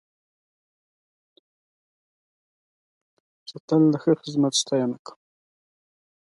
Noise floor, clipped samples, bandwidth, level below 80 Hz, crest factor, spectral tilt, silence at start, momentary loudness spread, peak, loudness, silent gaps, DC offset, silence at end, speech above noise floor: under -90 dBFS; under 0.1%; 11.5 kHz; -76 dBFS; 20 dB; -5 dB/octave; 3.5 s; 22 LU; -8 dBFS; -22 LUFS; 3.60-3.68 s; under 0.1%; 1.45 s; over 68 dB